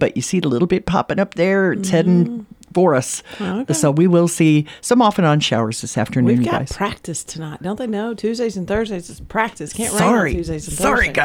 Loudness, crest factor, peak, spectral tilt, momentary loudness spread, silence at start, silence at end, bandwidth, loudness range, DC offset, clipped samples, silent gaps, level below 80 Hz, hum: -18 LUFS; 16 dB; -2 dBFS; -5.5 dB/octave; 11 LU; 0 s; 0 s; 17 kHz; 5 LU; under 0.1%; under 0.1%; none; -40 dBFS; none